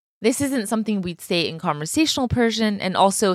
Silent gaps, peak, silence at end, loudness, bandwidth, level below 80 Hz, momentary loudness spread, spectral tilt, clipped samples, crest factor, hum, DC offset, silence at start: none; -4 dBFS; 0 s; -21 LUFS; 15 kHz; -48 dBFS; 5 LU; -4 dB/octave; under 0.1%; 16 dB; none; under 0.1%; 0.2 s